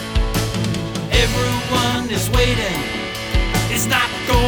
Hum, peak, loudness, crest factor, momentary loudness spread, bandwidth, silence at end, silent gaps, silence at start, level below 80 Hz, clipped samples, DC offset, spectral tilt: none; -4 dBFS; -19 LUFS; 14 dB; 5 LU; over 20 kHz; 0 s; none; 0 s; -24 dBFS; under 0.1%; under 0.1%; -4 dB/octave